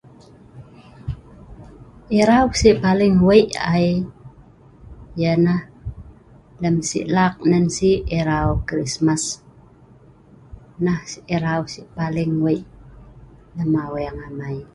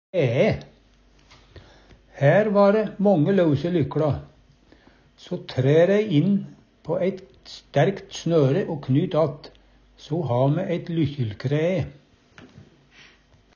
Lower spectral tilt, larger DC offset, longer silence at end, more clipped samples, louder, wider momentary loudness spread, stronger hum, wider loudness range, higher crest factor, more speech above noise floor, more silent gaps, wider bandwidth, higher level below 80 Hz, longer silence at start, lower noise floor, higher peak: second, -6 dB/octave vs -8 dB/octave; neither; second, 0.1 s vs 1.1 s; neither; first, -19 LUFS vs -22 LUFS; first, 18 LU vs 14 LU; neither; about the same, 7 LU vs 5 LU; about the same, 20 dB vs 18 dB; second, 30 dB vs 35 dB; neither; first, 11.5 kHz vs 7 kHz; first, -38 dBFS vs -52 dBFS; first, 0.55 s vs 0.15 s; second, -48 dBFS vs -56 dBFS; first, 0 dBFS vs -6 dBFS